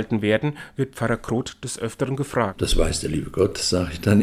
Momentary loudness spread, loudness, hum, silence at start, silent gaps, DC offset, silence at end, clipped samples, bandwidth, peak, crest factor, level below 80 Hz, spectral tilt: 8 LU; -24 LUFS; none; 0 s; none; under 0.1%; 0 s; under 0.1%; 16 kHz; -4 dBFS; 18 dB; -32 dBFS; -5 dB/octave